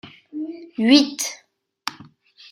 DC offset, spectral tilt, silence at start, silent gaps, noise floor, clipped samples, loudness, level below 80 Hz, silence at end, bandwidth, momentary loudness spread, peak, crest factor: under 0.1%; -2.5 dB/octave; 0.05 s; none; -48 dBFS; under 0.1%; -19 LUFS; -68 dBFS; 0.5 s; 16 kHz; 19 LU; -2 dBFS; 22 dB